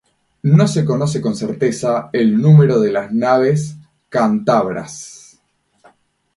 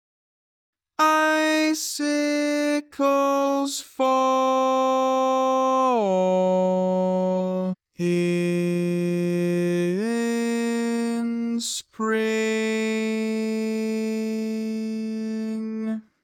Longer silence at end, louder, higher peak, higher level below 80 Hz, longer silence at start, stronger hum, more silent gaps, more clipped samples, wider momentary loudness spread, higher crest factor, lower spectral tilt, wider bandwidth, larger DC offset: first, 1.2 s vs 0.25 s; first, -15 LUFS vs -23 LUFS; first, 0 dBFS vs -6 dBFS; first, -56 dBFS vs -76 dBFS; second, 0.45 s vs 1 s; neither; neither; neither; first, 13 LU vs 8 LU; about the same, 16 dB vs 18 dB; first, -7.5 dB/octave vs -5 dB/octave; second, 11.5 kHz vs 17.5 kHz; neither